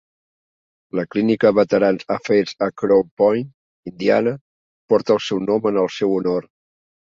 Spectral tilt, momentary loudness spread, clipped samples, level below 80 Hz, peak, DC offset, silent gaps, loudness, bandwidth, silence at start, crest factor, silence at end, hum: -6.5 dB/octave; 11 LU; under 0.1%; -60 dBFS; -2 dBFS; under 0.1%; 3.11-3.17 s, 3.54-3.83 s, 4.41-4.88 s; -19 LUFS; 7.6 kHz; 0.95 s; 18 dB; 0.7 s; none